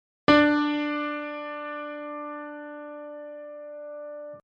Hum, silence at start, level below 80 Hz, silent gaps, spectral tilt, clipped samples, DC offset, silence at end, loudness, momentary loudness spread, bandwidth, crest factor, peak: none; 0.3 s; -60 dBFS; none; -6 dB/octave; under 0.1%; under 0.1%; 0.05 s; -26 LUFS; 21 LU; 7.2 kHz; 22 dB; -6 dBFS